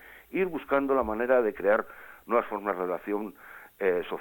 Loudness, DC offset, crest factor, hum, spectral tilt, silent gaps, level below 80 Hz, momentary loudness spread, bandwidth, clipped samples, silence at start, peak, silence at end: -28 LUFS; under 0.1%; 18 dB; none; -7 dB/octave; none; -58 dBFS; 16 LU; 17.5 kHz; under 0.1%; 0.05 s; -10 dBFS; 0 s